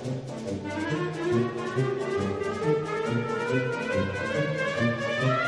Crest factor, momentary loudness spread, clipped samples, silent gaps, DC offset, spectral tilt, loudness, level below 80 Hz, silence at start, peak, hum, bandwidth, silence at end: 14 dB; 5 LU; under 0.1%; none; under 0.1%; -6.5 dB/octave; -28 LUFS; -60 dBFS; 0 s; -12 dBFS; none; 10.5 kHz; 0 s